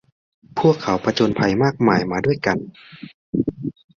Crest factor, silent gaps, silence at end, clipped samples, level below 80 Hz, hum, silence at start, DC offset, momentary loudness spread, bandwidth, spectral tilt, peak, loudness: 18 dB; 3.14-3.33 s; 0.25 s; under 0.1%; -50 dBFS; none; 0.55 s; under 0.1%; 19 LU; 7.4 kHz; -6.5 dB/octave; -2 dBFS; -20 LUFS